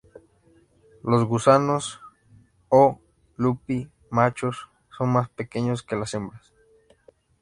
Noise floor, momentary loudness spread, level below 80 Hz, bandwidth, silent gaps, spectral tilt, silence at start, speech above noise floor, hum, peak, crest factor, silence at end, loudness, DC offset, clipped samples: -59 dBFS; 16 LU; -58 dBFS; 11.5 kHz; none; -6.5 dB/octave; 1.05 s; 37 dB; none; -2 dBFS; 22 dB; 1.05 s; -23 LUFS; under 0.1%; under 0.1%